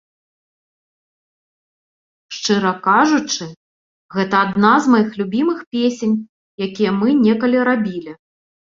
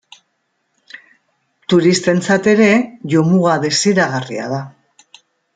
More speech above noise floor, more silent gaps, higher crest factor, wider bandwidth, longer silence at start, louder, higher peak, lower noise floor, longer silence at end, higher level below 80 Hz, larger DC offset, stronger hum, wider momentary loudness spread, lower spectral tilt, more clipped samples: first, over 74 dB vs 54 dB; first, 3.57-4.09 s, 5.67-5.71 s, 6.29-6.58 s vs none; about the same, 18 dB vs 16 dB; second, 7.6 kHz vs 9.4 kHz; first, 2.3 s vs 1.7 s; second, -17 LUFS vs -14 LUFS; about the same, -2 dBFS vs 0 dBFS; first, under -90 dBFS vs -68 dBFS; second, 0.55 s vs 0.85 s; about the same, -62 dBFS vs -58 dBFS; neither; neither; about the same, 13 LU vs 12 LU; about the same, -5 dB/octave vs -5 dB/octave; neither